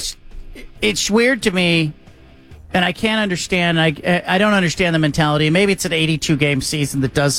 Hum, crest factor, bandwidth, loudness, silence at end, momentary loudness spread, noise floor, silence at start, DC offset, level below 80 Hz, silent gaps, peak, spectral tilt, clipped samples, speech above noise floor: none; 14 dB; 16 kHz; -17 LUFS; 0 s; 5 LU; -43 dBFS; 0 s; under 0.1%; -40 dBFS; none; -2 dBFS; -4.5 dB/octave; under 0.1%; 27 dB